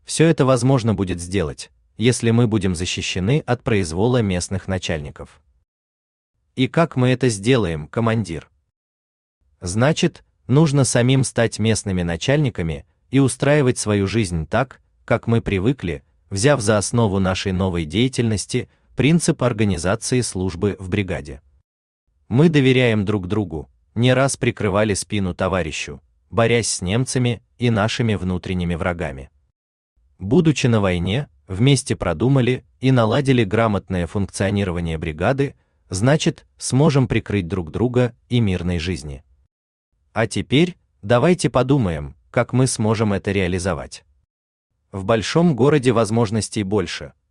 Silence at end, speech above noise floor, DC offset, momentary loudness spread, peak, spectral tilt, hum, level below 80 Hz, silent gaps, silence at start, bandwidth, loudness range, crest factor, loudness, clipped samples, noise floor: 0.2 s; over 71 dB; under 0.1%; 11 LU; -2 dBFS; -5.5 dB/octave; none; -44 dBFS; 5.68-6.34 s, 8.76-9.41 s, 21.64-22.07 s, 29.56-29.96 s, 39.51-39.92 s, 44.30-44.70 s; 0.1 s; 12 kHz; 4 LU; 16 dB; -19 LUFS; under 0.1%; under -90 dBFS